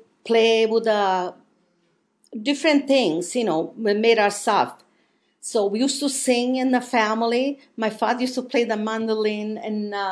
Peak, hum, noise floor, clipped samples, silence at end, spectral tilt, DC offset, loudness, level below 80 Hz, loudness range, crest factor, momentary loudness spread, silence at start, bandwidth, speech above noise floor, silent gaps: -4 dBFS; none; -67 dBFS; under 0.1%; 0 s; -3.5 dB/octave; under 0.1%; -21 LUFS; -82 dBFS; 2 LU; 18 dB; 10 LU; 0.25 s; 11 kHz; 46 dB; none